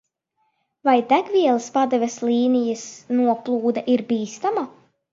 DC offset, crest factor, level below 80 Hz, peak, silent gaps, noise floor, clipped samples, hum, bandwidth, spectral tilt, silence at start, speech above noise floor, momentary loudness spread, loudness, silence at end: under 0.1%; 18 dB; -72 dBFS; -4 dBFS; none; -71 dBFS; under 0.1%; none; 7.6 kHz; -4.5 dB/octave; 0.85 s; 51 dB; 7 LU; -21 LUFS; 0.45 s